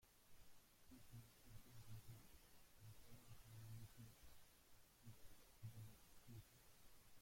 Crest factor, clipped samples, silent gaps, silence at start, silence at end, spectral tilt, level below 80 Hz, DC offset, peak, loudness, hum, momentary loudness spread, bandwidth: 16 dB; under 0.1%; none; 0 s; 0 s; -4.5 dB/octave; -74 dBFS; under 0.1%; -46 dBFS; -65 LUFS; none; 8 LU; 16.5 kHz